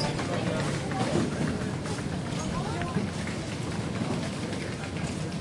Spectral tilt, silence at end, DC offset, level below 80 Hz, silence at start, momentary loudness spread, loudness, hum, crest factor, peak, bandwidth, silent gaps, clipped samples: -5.5 dB/octave; 0 s; under 0.1%; -50 dBFS; 0 s; 5 LU; -31 LUFS; none; 18 dB; -12 dBFS; 11.5 kHz; none; under 0.1%